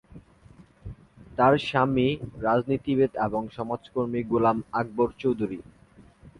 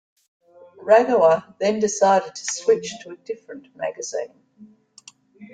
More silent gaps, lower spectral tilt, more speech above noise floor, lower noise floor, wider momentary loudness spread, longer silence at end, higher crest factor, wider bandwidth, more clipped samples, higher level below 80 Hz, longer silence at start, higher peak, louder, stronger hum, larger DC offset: neither; first, -8 dB/octave vs -3.5 dB/octave; about the same, 29 dB vs 30 dB; first, -54 dBFS vs -50 dBFS; about the same, 16 LU vs 18 LU; about the same, 0.1 s vs 0.05 s; about the same, 20 dB vs 20 dB; first, 11 kHz vs 9.4 kHz; neither; first, -52 dBFS vs -70 dBFS; second, 0.1 s vs 0.8 s; second, -8 dBFS vs -2 dBFS; second, -26 LUFS vs -20 LUFS; neither; neither